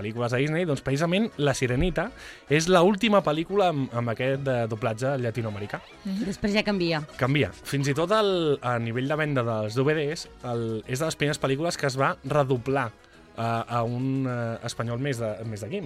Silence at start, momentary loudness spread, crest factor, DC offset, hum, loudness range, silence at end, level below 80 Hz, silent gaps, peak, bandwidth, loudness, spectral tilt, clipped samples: 0 s; 9 LU; 20 dB; under 0.1%; none; 4 LU; 0 s; -48 dBFS; none; -6 dBFS; 15 kHz; -26 LUFS; -5.5 dB/octave; under 0.1%